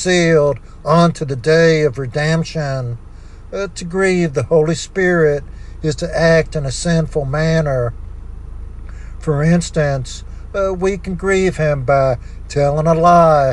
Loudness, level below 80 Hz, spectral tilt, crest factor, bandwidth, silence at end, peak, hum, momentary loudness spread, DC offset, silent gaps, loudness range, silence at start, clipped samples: -16 LUFS; -32 dBFS; -6 dB/octave; 14 dB; 10.5 kHz; 0 s; 0 dBFS; none; 17 LU; under 0.1%; none; 4 LU; 0 s; under 0.1%